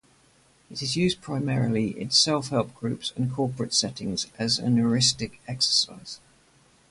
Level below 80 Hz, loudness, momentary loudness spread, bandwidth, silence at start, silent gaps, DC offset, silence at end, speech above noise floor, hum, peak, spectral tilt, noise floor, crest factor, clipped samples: -58 dBFS; -25 LUFS; 12 LU; 11.5 kHz; 0.7 s; none; under 0.1%; 0.75 s; 34 dB; none; -8 dBFS; -4 dB/octave; -60 dBFS; 20 dB; under 0.1%